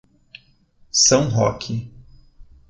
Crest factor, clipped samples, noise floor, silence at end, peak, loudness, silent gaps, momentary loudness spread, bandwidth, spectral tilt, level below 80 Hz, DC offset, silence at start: 20 dB; under 0.1%; -55 dBFS; 0.25 s; -2 dBFS; -18 LUFS; none; 15 LU; 9.2 kHz; -3.5 dB/octave; -48 dBFS; under 0.1%; 0.95 s